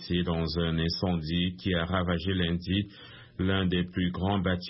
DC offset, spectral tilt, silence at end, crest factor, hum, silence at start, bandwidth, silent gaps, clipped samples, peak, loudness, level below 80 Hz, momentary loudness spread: under 0.1%; -10 dB/octave; 0 s; 14 dB; none; 0 s; 5.8 kHz; none; under 0.1%; -14 dBFS; -29 LUFS; -46 dBFS; 3 LU